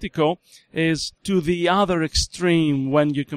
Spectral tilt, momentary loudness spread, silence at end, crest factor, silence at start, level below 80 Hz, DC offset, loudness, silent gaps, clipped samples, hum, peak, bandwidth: -5 dB/octave; 5 LU; 0 s; 16 dB; 0 s; -38 dBFS; under 0.1%; -21 LUFS; none; under 0.1%; none; -6 dBFS; 14.5 kHz